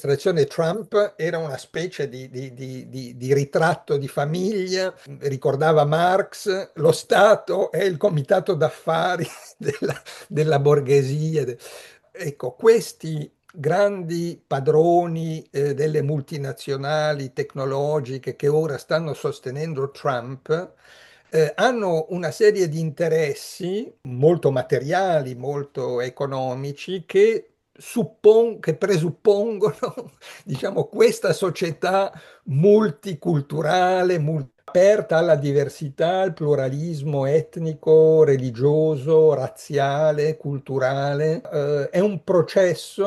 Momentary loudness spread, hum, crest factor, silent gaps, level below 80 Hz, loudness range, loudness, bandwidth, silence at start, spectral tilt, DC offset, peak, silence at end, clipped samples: 13 LU; none; 18 dB; none; -66 dBFS; 5 LU; -21 LUFS; 12.5 kHz; 0.05 s; -6.5 dB/octave; under 0.1%; -4 dBFS; 0 s; under 0.1%